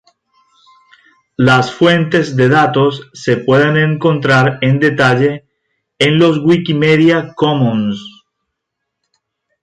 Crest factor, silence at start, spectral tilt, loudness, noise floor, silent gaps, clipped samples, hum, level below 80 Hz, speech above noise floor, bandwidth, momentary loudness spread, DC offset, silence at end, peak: 14 dB; 1.4 s; -6.5 dB/octave; -12 LUFS; -76 dBFS; none; under 0.1%; none; -52 dBFS; 64 dB; 10.5 kHz; 7 LU; under 0.1%; 1.55 s; 0 dBFS